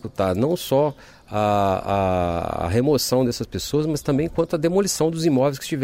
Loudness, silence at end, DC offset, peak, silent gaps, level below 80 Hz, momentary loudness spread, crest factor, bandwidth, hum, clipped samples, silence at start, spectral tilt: -21 LUFS; 0 s; under 0.1%; -8 dBFS; none; -44 dBFS; 5 LU; 14 dB; 16 kHz; none; under 0.1%; 0.05 s; -5.5 dB/octave